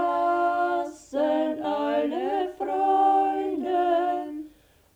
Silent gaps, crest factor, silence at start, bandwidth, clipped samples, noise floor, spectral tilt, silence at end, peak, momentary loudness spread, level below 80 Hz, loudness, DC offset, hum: none; 12 dB; 0 s; 10 kHz; under 0.1%; -53 dBFS; -5 dB/octave; 0.5 s; -12 dBFS; 10 LU; -64 dBFS; -25 LUFS; under 0.1%; none